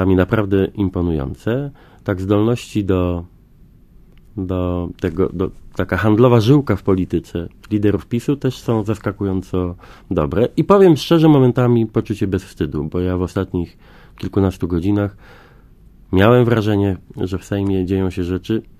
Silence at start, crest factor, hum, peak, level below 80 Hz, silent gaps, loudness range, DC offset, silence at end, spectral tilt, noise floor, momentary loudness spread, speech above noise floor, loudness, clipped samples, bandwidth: 0 s; 18 dB; none; 0 dBFS; -34 dBFS; none; 7 LU; under 0.1%; 0.2 s; -8 dB/octave; -46 dBFS; 13 LU; 30 dB; -18 LUFS; under 0.1%; 15.5 kHz